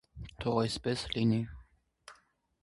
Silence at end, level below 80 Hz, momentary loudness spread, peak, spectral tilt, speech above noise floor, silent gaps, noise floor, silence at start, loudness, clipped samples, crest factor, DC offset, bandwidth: 0.5 s; -54 dBFS; 11 LU; -14 dBFS; -6 dB/octave; 36 dB; none; -67 dBFS; 0.15 s; -33 LUFS; under 0.1%; 20 dB; under 0.1%; 11.5 kHz